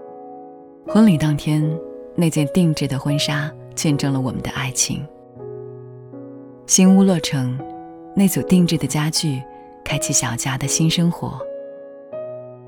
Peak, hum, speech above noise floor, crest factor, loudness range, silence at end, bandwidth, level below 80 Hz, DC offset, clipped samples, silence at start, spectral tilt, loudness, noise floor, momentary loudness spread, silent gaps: -2 dBFS; none; 22 dB; 18 dB; 4 LU; 0 s; over 20 kHz; -48 dBFS; under 0.1%; under 0.1%; 0 s; -4.5 dB/octave; -19 LUFS; -40 dBFS; 22 LU; none